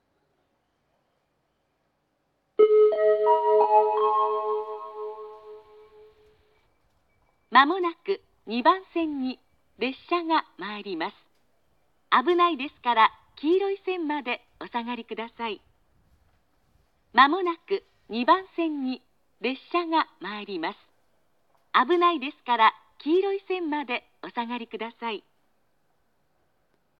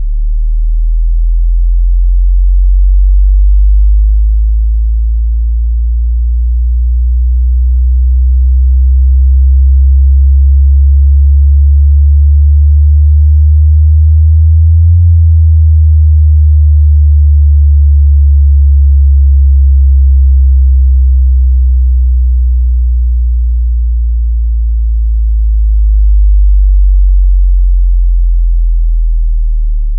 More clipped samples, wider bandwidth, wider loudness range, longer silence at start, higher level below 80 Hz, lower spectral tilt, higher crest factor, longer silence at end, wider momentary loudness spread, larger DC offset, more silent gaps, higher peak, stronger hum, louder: neither; first, 5.6 kHz vs 0.1 kHz; first, 8 LU vs 5 LU; first, 2.6 s vs 0 s; second, -74 dBFS vs -6 dBFS; second, -6 dB/octave vs -15 dB/octave; first, 22 dB vs 4 dB; first, 1.8 s vs 0 s; first, 15 LU vs 6 LU; neither; neither; second, -4 dBFS vs 0 dBFS; neither; second, -25 LUFS vs -9 LUFS